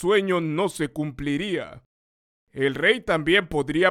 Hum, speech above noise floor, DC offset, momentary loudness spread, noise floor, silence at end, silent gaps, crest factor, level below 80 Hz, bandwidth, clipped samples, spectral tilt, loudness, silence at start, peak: none; over 67 dB; under 0.1%; 9 LU; under -90 dBFS; 0 s; 1.86-2.47 s; 18 dB; -50 dBFS; 14.5 kHz; under 0.1%; -5 dB/octave; -23 LUFS; 0 s; -6 dBFS